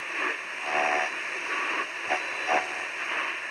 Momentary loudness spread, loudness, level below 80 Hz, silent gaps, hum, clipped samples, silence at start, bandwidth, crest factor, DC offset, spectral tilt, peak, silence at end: 5 LU; -28 LUFS; -86 dBFS; none; none; under 0.1%; 0 s; 13 kHz; 18 dB; under 0.1%; -0.5 dB/octave; -12 dBFS; 0 s